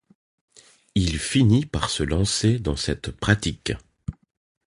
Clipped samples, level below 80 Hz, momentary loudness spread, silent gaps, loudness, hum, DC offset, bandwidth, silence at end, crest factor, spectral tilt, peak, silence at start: under 0.1%; -38 dBFS; 13 LU; none; -23 LUFS; none; under 0.1%; 11.5 kHz; 0.55 s; 22 dB; -5 dB/octave; -2 dBFS; 0.95 s